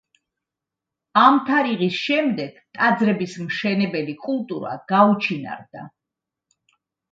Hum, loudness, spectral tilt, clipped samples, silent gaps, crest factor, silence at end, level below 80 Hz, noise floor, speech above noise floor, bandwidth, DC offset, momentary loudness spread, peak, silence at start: none; -20 LUFS; -6.5 dB/octave; under 0.1%; none; 22 dB; 1.25 s; -70 dBFS; -86 dBFS; 65 dB; 7.8 kHz; under 0.1%; 15 LU; 0 dBFS; 1.15 s